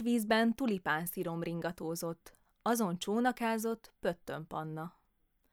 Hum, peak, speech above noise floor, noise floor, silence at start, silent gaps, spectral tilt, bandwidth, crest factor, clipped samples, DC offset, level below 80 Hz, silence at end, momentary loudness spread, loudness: none; -16 dBFS; 40 dB; -75 dBFS; 0 s; none; -5 dB/octave; 19 kHz; 18 dB; under 0.1%; under 0.1%; -68 dBFS; 0.65 s; 12 LU; -35 LUFS